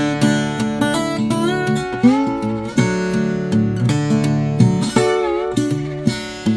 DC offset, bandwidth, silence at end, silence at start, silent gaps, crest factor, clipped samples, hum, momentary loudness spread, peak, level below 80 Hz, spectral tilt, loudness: under 0.1%; 11 kHz; 0 s; 0 s; none; 18 dB; under 0.1%; none; 5 LU; 0 dBFS; -44 dBFS; -6 dB/octave; -18 LUFS